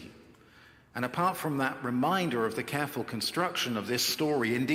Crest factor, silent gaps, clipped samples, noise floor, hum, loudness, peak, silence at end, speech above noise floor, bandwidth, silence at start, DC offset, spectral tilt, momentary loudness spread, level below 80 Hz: 18 dB; none; under 0.1%; -57 dBFS; none; -30 LUFS; -14 dBFS; 0 s; 27 dB; 16.5 kHz; 0 s; under 0.1%; -4 dB/octave; 5 LU; -70 dBFS